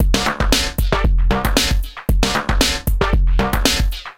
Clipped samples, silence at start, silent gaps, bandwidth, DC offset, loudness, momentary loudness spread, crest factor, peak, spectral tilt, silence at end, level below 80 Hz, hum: under 0.1%; 0 s; none; 17 kHz; 1%; -18 LUFS; 3 LU; 14 dB; -2 dBFS; -4 dB/octave; 0 s; -18 dBFS; none